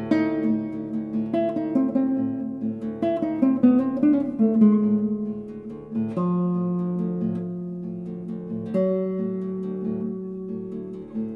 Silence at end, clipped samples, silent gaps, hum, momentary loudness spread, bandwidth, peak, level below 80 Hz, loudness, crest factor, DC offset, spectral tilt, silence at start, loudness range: 0 s; under 0.1%; none; none; 13 LU; 5 kHz; -6 dBFS; -60 dBFS; -25 LUFS; 16 dB; under 0.1%; -10.5 dB/octave; 0 s; 7 LU